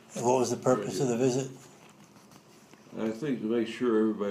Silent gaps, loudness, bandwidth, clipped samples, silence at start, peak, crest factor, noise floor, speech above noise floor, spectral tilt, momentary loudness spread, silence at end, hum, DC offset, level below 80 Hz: none; -29 LUFS; 15 kHz; under 0.1%; 0.1 s; -12 dBFS; 18 dB; -55 dBFS; 27 dB; -5.5 dB/octave; 9 LU; 0 s; none; under 0.1%; -78 dBFS